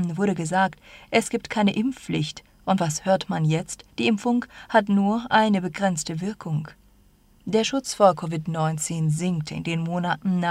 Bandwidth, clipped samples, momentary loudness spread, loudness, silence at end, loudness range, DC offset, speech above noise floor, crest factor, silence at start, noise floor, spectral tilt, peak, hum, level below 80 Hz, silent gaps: 15 kHz; under 0.1%; 9 LU; -24 LUFS; 0 s; 2 LU; under 0.1%; 33 dB; 20 dB; 0 s; -57 dBFS; -5.5 dB/octave; -4 dBFS; none; -58 dBFS; none